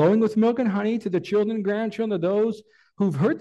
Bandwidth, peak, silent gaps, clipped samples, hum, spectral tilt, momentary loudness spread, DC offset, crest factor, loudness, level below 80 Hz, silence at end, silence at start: 8.2 kHz; -8 dBFS; none; under 0.1%; none; -8.5 dB/octave; 6 LU; under 0.1%; 14 dB; -23 LUFS; -70 dBFS; 0 s; 0 s